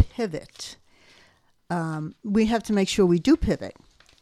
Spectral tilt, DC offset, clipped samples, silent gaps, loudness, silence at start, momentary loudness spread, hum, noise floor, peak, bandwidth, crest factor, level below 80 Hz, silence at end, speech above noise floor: -6 dB/octave; under 0.1%; under 0.1%; none; -24 LUFS; 0 s; 18 LU; none; -60 dBFS; -6 dBFS; 14 kHz; 18 dB; -44 dBFS; 0.5 s; 36 dB